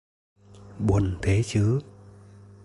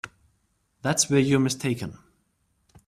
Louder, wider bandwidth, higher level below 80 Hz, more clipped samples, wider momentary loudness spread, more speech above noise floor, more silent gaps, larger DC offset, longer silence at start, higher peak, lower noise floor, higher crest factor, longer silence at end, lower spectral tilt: about the same, -25 LUFS vs -24 LUFS; second, 11.5 kHz vs 15 kHz; first, -40 dBFS vs -60 dBFS; neither; second, 5 LU vs 15 LU; second, 26 dB vs 47 dB; neither; neither; first, 0.55 s vs 0.05 s; about the same, -10 dBFS vs -8 dBFS; second, -48 dBFS vs -70 dBFS; about the same, 18 dB vs 18 dB; second, 0.8 s vs 0.95 s; first, -7 dB/octave vs -4.5 dB/octave